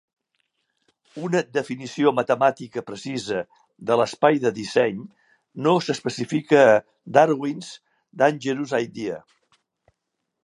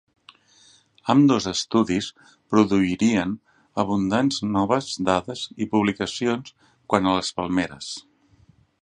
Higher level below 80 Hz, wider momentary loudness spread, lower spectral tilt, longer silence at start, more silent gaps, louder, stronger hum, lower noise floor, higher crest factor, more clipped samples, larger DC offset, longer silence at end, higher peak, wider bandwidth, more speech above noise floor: second, -70 dBFS vs -54 dBFS; first, 16 LU vs 13 LU; about the same, -5.5 dB/octave vs -5 dB/octave; about the same, 1.15 s vs 1.05 s; neither; about the same, -22 LUFS vs -23 LUFS; neither; first, -80 dBFS vs -57 dBFS; about the same, 22 dB vs 22 dB; neither; neither; first, 1.25 s vs 0.8 s; about the same, 0 dBFS vs -2 dBFS; first, 11.5 kHz vs 10 kHz; first, 58 dB vs 35 dB